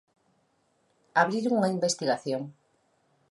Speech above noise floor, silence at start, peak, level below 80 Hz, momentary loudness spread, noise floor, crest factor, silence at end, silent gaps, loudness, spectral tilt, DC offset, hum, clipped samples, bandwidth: 44 dB; 1.15 s; -8 dBFS; -80 dBFS; 9 LU; -71 dBFS; 22 dB; 0.8 s; none; -27 LUFS; -4.5 dB/octave; under 0.1%; none; under 0.1%; 11.5 kHz